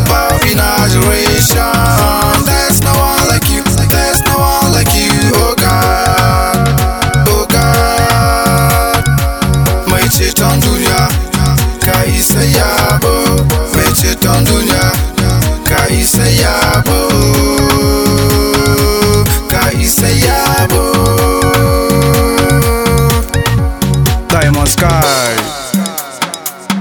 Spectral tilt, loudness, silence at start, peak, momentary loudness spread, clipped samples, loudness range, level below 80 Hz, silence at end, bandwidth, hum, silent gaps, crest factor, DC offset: -4.5 dB/octave; -10 LUFS; 0 s; 0 dBFS; 3 LU; 0.4%; 1 LU; -18 dBFS; 0 s; over 20 kHz; none; none; 10 dB; 0.4%